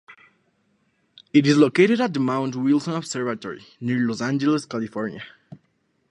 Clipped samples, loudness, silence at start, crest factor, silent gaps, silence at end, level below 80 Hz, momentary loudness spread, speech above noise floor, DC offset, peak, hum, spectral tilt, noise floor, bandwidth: under 0.1%; -22 LUFS; 0.1 s; 20 dB; none; 0.55 s; -70 dBFS; 15 LU; 47 dB; under 0.1%; -4 dBFS; none; -6 dB/octave; -68 dBFS; 11 kHz